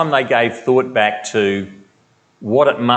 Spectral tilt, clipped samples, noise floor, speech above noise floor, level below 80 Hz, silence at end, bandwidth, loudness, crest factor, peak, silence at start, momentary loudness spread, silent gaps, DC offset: -5 dB/octave; under 0.1%; -57 dBFS; 41 dB; -68 dBFS; 0 s; 8.8 kHz; -16 LUFS; 16 dB; 0 dBFS; 0 s; 10 LU; none; under 0.1%